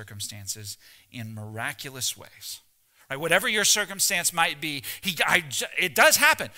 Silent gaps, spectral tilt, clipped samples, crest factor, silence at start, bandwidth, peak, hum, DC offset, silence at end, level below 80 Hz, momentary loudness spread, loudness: none; -1 dB/octave; under 0.1%; 22 dB; 0 s; 16.5 kHz; -4 dBFS; none; under 0.1%; 0.05 s; -64 dBFS; 19 LU; -23 LUFS